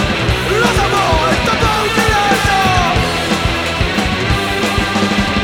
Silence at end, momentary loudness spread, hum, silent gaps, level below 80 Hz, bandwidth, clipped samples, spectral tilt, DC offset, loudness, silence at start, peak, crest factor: 0 s; 3 LU; none; none; -24 dBFS; 20 kHz; under 0.1%; -4.5 dB/octave; under 0.1%; -13 LUFS; 0 s; 0 dBFS; 14 dB